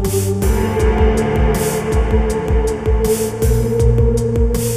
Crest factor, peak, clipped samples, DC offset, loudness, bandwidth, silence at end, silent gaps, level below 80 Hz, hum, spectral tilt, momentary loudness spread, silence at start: 12 dB; -2 dBFS; under 0.1%; under 0.1%; -16 LUFS; 15.5 kHz; 0 s; none; -18 dBFS; none; -6.5 dB/octave; 3 LU; 0 s